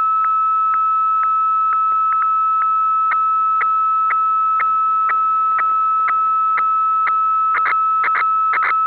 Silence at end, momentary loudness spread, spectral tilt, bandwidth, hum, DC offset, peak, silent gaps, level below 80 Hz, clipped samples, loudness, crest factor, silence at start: 0 s; 0 LU; -4 dB/octave; 4 kHz; 50 Hz at -85 dBFS; 0.1%; -12 dBFS; none; -70 dBFS; under 0.1%; -15 LUFS; 4 dB; 0 s